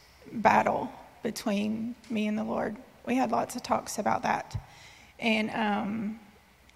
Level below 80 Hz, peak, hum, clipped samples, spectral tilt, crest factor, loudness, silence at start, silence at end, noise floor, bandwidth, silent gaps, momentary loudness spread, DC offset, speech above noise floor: -60 dBFS; -8 dBFS; none; under 0.1%; -5 dB/octave; 24 dB; -30 LUFS; 0.25 s; 0.5 s; -57 dBFS; 15 kHz; none; 15 LU; under 0.1%; 28 dB